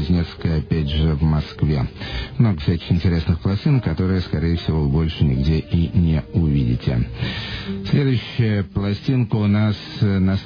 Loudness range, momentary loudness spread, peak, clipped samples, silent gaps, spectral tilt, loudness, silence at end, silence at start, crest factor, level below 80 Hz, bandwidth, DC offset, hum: 1 LU; 5 LU; -4 dBFS; under 0.1%; none; -9 dB/octave; -20 LUFS; 0 s; 0 s; 14 dB; -30 dBFS; 5.4 kHz; under 0.1%; none